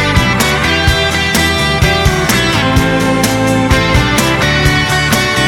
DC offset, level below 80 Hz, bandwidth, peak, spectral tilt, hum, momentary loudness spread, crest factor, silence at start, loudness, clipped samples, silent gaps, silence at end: under 0.1%; -22 dBFS; 19.5 kHz; 0 dBFS; -4 dB/octave; none; 1 LU; 10 dB; 0 s; -11 LUFS; under 0.1%; none; 0 s